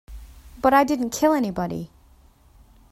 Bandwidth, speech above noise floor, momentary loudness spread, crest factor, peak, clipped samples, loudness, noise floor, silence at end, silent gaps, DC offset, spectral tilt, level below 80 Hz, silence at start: 15.5 kHz; 33 dB; 14 LU; 20 dB; -4 dBFS; under 0.1%; -21 LUFS; -54 dBFS; 1.05 s; none; under 0.1%; -5 dB/octave; -46 dBFS; 0.1 s